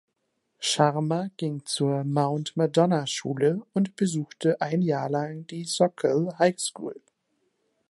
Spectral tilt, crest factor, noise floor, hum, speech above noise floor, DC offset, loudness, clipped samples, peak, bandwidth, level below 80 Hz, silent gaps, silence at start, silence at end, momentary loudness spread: -5 dB/octave; 22 dB; -77 dBFS; none; 51 dB; under 0.1%; -26 LUFS; under 0.1%; -6 dBFS; 11.5 kHz; -74 dBFS; none; 0.6 s; 0.95 s; 8 LU